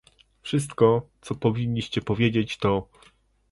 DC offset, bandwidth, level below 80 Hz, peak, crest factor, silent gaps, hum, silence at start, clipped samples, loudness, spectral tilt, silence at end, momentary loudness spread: under 0.1%; 11.5 kHz; -52 dBFS; -6 dBFS; 20 dB; none; none; 0.45 s; under 0.1%; -25 LUFS; -6.5 dB/octave; 0.7 s; 8 LU